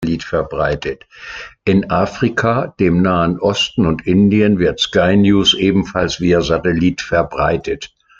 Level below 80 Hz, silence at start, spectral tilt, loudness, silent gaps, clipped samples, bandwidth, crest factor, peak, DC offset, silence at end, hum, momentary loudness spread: -38 dBFS; 0 s; -5.5 dB/octave; -15 LUFS; none; under 0.1%; 7.6 kHz; 14 dB; 0 dBFS; under 0.1%; 0.35 s; none; 11 LU